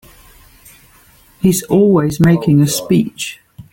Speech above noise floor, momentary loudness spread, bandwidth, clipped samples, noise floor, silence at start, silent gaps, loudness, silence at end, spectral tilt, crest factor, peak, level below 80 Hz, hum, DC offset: 35 dB; 10 LU; 17 kHz; under 0.1%; -47 dBFS; 1.45 s; none; -13 LUFS; 0.1 s; -6 dB/octave; 14 dB; -2 dBFS; -44 dBFS; none; under 0.1%